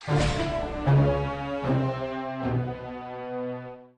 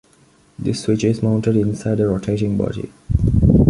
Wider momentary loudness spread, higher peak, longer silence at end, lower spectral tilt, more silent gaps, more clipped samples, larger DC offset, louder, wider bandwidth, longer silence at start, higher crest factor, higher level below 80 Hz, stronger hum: first, 13 LU vs 8 LU; second, -12 dBFS vs -2 dBFS; about the same, 0.1 s vs 0 s; about the same, -7 dB/octave vs -8 dB/octave; neither; neither; neither; second, -28 LUFS vs -19 LUFS; second, 9.8 kHz vs 11.5 kHz; second, 0 s vs 0.6 s; about the same, 16 dB vs 16 dB; second, -40 dBFS vs -28 dBFS; neither